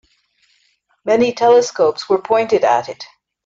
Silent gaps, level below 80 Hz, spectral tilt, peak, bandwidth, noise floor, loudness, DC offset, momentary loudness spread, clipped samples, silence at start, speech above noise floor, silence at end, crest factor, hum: none; -62 dBFS; -4 dB/octave; -2 dBFS; 7.6 kHz; -61 dBFS; -15 LUFS; under 0.1%; 17 LU; under 0.1%; 1.05 s; 47 dB; 0.4 s; 14 dB; none